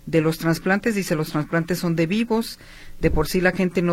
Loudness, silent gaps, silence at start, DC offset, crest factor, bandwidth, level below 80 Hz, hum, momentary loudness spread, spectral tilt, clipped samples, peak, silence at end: -22 LUFS; none; 0.05 s; under 0.1%; 16 dB; 16.5 kHz; -36 dBFS; none; 4 LU; -6 dB/octave; under 0.1%; -4 dBFS; 0 s